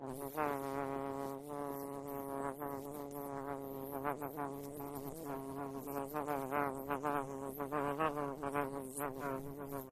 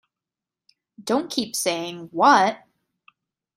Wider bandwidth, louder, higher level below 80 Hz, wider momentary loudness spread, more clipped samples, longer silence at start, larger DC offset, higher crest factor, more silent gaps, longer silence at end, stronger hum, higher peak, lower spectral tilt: about the same, 14.5 kHz vs 15.5 kHz; second, -42 LUFS vs -21 LUFS; first, -66 dBFS vs -72 dBFS; second, 7 LU vs 17 LU; neither; second, 0 s vs 1 s; neither; about the same, 20 dB vs 22 dB; neither; second, 0 s vs 1 s; neither; second, -20 dBFS vs -2 dBFS; first, -6 dB/octave vs -2.5 dB/octave